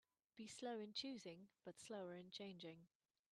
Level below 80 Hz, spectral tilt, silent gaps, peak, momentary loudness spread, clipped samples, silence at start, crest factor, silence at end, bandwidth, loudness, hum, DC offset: under -90 dBFS; -4 dB/octave; none; -34 dBFS; 11 LU; under 0.1%; 0.35 s; 20 dB; 0.45 s; 13 kHz; -54 LUFS; none; under 0.1%